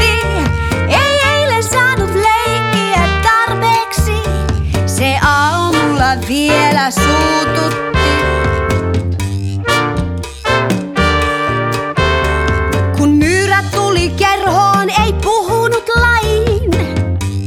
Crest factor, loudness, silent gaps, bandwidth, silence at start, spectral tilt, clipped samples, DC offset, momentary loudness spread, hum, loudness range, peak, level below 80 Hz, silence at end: 12 dB; -13 LUFS; none; 17 kHz; 0 s; -5 dB/octave; under 0.1%; under 0.1%; 5 LU; none; 3 LU; 0 dBFS; -24 dBFS; 0 s